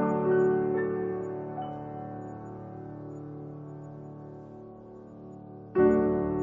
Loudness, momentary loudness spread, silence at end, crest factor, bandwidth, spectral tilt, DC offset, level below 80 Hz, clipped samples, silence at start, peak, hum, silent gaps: -28 LUFS; 22 LU; 0 s; 18 dB; 3.2 kHz; -10 dB/octave; under 0.1%; -58 dBFS; under 0.1%; 0 s; -12 dBFS; none; none